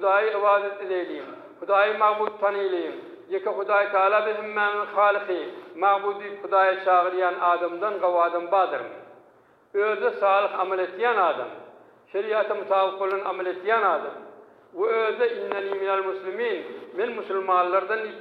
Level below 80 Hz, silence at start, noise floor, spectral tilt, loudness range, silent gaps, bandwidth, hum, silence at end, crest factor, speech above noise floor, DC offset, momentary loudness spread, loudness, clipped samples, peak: -86 dBFS; 0 s; -57 dBFS; -6 dB/octave; 3 LU; none; 5 kHz; none; 0 s; 18 dB; 33 dB; under 0.1%; 12 LU; -24 LUFS; under 0.1%; -8 dBFS